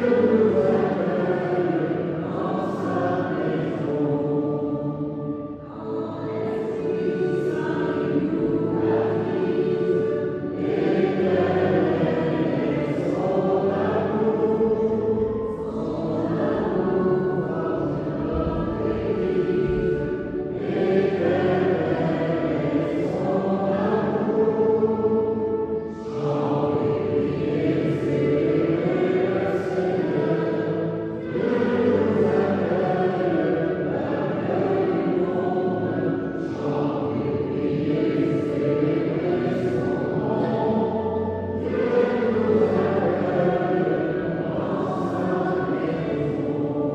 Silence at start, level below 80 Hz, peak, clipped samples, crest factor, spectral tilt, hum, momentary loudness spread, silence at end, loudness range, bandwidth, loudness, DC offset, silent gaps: 0 s; -48 dBFS; -8 dBFS; under 0.1%; 14 dB; -9 dB/octave; none; 6 LU; 0 s; 3 LU; 8 kHz; -23 LUFS; under 0.1%; none